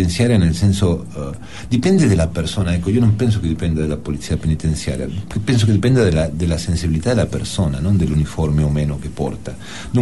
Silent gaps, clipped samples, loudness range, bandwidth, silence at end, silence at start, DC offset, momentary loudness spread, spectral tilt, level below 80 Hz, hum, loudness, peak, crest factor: none; under 0.1%; 2 LU; 12 kHz; 0 s; 0 s; 2%; 10 LU; -6.5 dB/octave; -30 dBFS; none; -18 LUFS; -4 dBFS; 14 dB